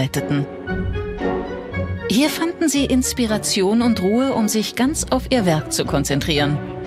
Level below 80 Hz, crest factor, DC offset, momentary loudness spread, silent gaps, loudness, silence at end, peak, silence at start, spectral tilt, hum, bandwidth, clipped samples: -36 dBFS; 16 dB; under 0.1%; 8 LU; none; -19 LUFS; 0 s; -4 dBFS; 0 s; -4.5 dB/octave; none; 16 kHz; under 0.1%